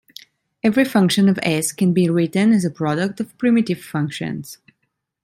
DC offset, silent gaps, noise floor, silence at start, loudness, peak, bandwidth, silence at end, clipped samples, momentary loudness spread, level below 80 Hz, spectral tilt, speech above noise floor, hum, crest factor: under 0.1%; none; -73 dBFS; 0.65 s; -19 LUFS; -4 dBFS; 16 kHz; 0.7 s; under 0.1%; 9 LU; -62 dBFS; -5.5 dB/octave; 55 dB; none; 14 dB